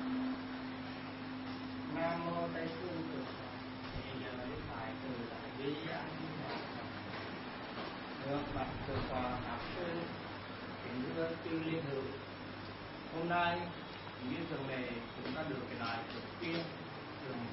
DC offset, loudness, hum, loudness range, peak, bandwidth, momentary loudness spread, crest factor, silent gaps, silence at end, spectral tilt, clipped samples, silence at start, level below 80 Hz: under 0.1%; -42 LUFS; none; 3 LU; -22 dBFS; 5.8 kHz; 7 LU; 18 dB; none; 0 s; -4 dB/octave; under 0.1%; 0 s; -60 dBFS